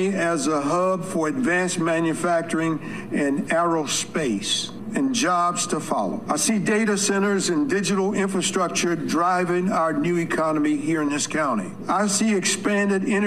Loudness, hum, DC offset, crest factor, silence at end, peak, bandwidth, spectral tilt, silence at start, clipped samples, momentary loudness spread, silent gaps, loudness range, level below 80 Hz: -22 LUFS; none; 0.4%; 14 dB; 0 s; -8 dBFS; 14.5 kHz; -4 dB/octave; 0 s; under 0.1%; 4 LU; none; 1 LU; -58 dBFS